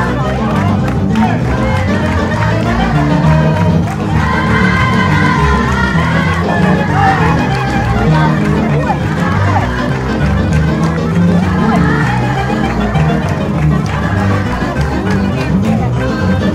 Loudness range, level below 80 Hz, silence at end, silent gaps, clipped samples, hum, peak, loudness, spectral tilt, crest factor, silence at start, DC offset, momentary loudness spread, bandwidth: 2 LU; -24 dBFS; 0 s; none; under 0.1%; none; 0 dBFS; -12 LUFS; -7 dB/octave; 12 dB; 0 s; under 0.1%; 4 LU; 12 kHz